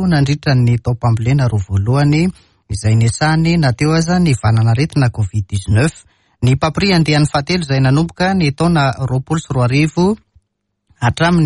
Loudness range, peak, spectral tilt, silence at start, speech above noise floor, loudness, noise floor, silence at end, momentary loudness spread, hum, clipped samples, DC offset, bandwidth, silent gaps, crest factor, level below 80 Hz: 1 LU; -2 dBFS; -6.5 dB/octave; 0 s; 57 dB; -15 LUFS; -70 dBFS; 0 s; 6 LU; none; under 0.1%; under 0.1%; 11.5 kHz; none; 12 dB; -36 dBFS